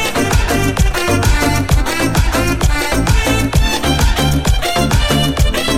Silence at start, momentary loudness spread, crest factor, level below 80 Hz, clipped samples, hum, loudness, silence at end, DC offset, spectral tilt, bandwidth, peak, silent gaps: 0 s; 2 LU; 12 dB; -18 dBFS; under 0.1%; none; -14 LUFS; 0 s; under 0.1%; -4.5 dB/octave; 16.5 kHz; 0 dBFS; none